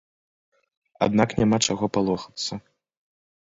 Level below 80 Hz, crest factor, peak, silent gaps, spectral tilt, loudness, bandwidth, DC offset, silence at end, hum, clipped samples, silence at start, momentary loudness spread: -54 dBFS; 22 dB; -4 dBFS; none; -4.5 dB/octave; -23 LUFS; 8 kHz; under 0.1%; 1 s; none; under 0.1%; 1 s; 10 LU